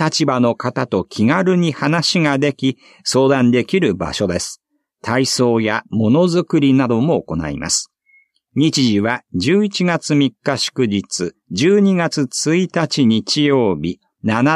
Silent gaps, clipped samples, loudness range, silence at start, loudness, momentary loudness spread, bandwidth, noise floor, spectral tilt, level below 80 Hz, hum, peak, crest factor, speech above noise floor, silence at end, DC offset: none; under 0.1%; 2 LU; 0 s; -16 LUFS; 8 LU; 13 kHz; -56 dBFS; -5 dB/octave; -50 dBFS; none; -2 dBFS; 14 dB; 40 dB; 0 s; under 0.1%